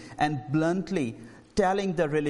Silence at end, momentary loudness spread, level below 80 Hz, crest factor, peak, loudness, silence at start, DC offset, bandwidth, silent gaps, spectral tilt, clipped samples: 0 s; 7 LU; -52 dBFS; 16 dB; -12 dBFS; -28 LUFS; 0 s; under 0.1%; 11.5 kHz; none; -6.5 dB/octave; under 0.1%